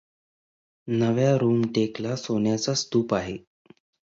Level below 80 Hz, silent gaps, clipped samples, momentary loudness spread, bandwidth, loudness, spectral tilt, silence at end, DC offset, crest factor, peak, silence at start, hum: -60 dBFS; none; under 0.1%; 10 LU; 7.8 kHz; -24 LUFS; -6 dB/octave; 0.75 s; under 0.1%; 16 dB; -10 dBFS; 0.85 s; none